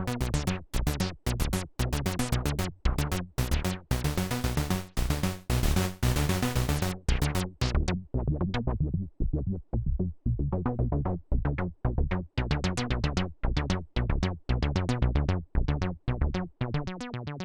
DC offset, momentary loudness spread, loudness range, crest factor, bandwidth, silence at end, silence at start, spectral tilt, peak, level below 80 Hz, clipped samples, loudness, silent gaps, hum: under 0.1%; 4 LU; 2 LU; 16 dB; over 20 kHz; 0 s; 0 s; -5.5 dB/octave; -14 dBFS; -32 dBFS; under 0.1%; -30 LUFS; none; none